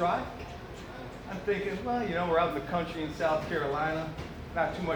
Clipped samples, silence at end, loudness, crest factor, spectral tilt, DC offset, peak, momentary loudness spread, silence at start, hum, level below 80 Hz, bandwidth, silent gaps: under 0.1%; 0 s; -32 LUFS; 18 dB; -6.5 dB/octave; under 0.1%; -14 dBFS; 14 LU; 0 s; none; -50 dBFS; over 20 kHz; none